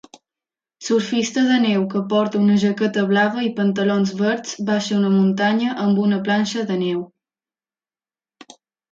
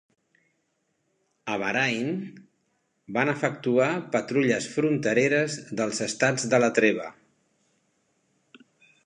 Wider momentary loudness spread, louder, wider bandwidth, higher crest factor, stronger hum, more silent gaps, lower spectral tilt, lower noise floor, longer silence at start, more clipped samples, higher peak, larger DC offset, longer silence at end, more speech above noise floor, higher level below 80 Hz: second, 5 LU vs 10 LU; first, -19 LUFS vs -25 LUFS; second, 7.6 kHz vs 11 kHz; second, 14 dB vs 22 dB; neither; neither; about the same, -5.5 dB/octave vs -4.5 dB/octave; first, under -90 dBFS vs -74 dBFS; second, 0.8 s vs 1.45 s; neither; about the same, -6 dBFS vs -6 dBFS; neither; about the same, 1.85 s vs 1.95 s; first, over 72 dB vs 49 dB; first, -66 dBFS vs -74 dBFS